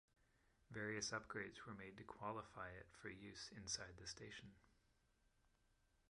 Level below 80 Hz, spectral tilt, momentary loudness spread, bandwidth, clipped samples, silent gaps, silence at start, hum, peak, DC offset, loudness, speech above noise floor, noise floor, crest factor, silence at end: -74 dBFS; -3 dB/octave; 11 LU; 11 kHz; under 0.1%; none; 0.7 s; none; -32 dBFS; under 0.1%; -52 LUFS; 28 dB; -81 dBFS; 22 dB; 0.65 s